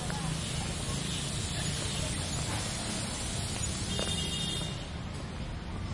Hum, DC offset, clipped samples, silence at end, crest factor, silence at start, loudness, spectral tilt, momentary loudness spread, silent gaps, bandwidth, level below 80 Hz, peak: none; under 0.1%; under 0.1%; 0 s; 16 dB; 0 s; -33 LUFS; -3.5 dB/octave; 8 LU; none; 11.5 kHz; -44 dBFS; -18 dBFS